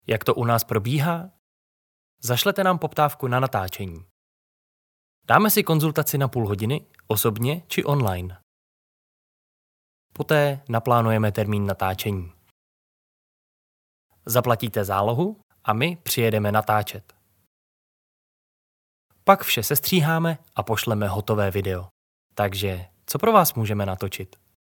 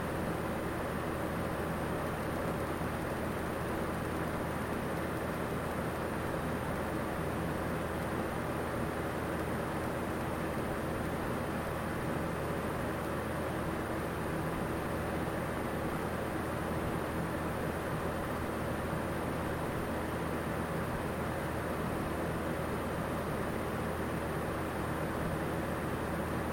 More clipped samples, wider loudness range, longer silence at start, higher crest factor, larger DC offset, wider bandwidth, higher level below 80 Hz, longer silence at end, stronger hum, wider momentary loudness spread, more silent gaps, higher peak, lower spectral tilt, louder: neither; first, 5 LU vs 0 LU; about the same, 0.1 s vs 0 s; first, 24 dB vs 14 dB; neither; first, 19.5 kHz vs 17 kHz; second, -62 dBFS vs -48 dBFS; first, 0.35 s vs 0 s; neither; first, 13 LU vs 1 LU; first, 1.39-2.18 s, 4.11-5.22 s, 8.43-10.10 s, 12.51-14.10 s, 15.43-15.50 s, 17.47-19.10 s, 21.91-22.30 s vs none; first, 0 dBFS vs -22 dBFS; about the same, -5 dB/octave vs -6 dB/octave; first, -23 LUFS vs -36 LUFS